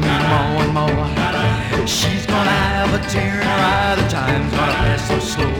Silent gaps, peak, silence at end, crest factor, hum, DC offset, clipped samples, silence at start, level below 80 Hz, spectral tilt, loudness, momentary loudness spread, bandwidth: none; -4 dBFS; 0 s; 14 dB; none; under 0.1%; under 0.1%; 0 s; -30 dBFS; -5 dB/octave; -17 LUFS; 3 LU; 18.5 kHz